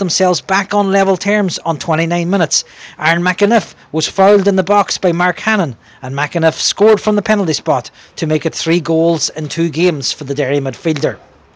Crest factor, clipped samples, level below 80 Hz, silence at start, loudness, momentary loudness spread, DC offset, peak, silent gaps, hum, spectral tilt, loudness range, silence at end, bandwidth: 14 dB; under 0.1%; -54 dBFS; 0 s; -14 LUFS; 7 LU; under 0.1%; 0 dBFS; none; none; -4.5 dB/octave; 2 LU; 0.4 s; 10 kHz